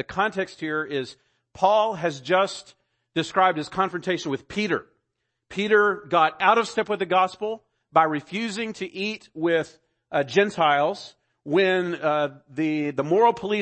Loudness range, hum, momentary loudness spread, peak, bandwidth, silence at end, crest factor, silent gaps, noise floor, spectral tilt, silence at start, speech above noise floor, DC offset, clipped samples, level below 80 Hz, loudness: 3 LU; none; 11 LU; -4 dBFS; 8.8 kHz; 0 s; 20 dB; none; -79 dBFS; -5 dB/octave; 0 s; 55 dB; under 0.1%; under 0.1%; -64 dBFS; -23 LUFS